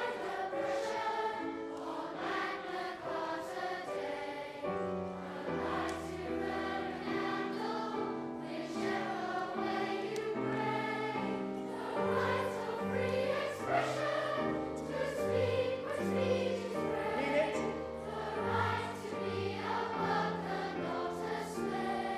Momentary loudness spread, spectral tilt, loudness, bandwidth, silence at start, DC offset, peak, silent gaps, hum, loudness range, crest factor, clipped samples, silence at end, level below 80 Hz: 7 LU; -5.5 dB/octave; -36 LUFS; 15 kHz; 0 s; under 0.1%; -20 dBFS; none; none; 4 LU; 16 dB; under 0.1%; 0 s; -64 dBFS